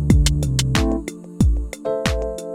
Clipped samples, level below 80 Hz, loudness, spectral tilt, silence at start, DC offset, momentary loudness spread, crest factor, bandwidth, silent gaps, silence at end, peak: under 0.1%; -24 dBFS; -21 LUFS; -5.5 dB/octave; 0 s; under 0.1%; 9 LU; 18 dB; 15 kHz; none; 0 s; -2 dBFS